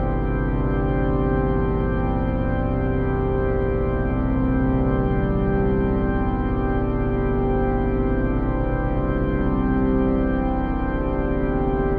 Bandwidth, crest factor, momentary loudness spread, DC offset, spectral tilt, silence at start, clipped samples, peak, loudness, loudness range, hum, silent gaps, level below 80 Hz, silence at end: 4.2 kHz; 12 dB; 3 LU; under 0.1%; -11.5 dB/octave; 0 s; under 0.1%; -8 dBFS; -22 LUFS; 1 LU; none; none; -26 dBFS; 0 s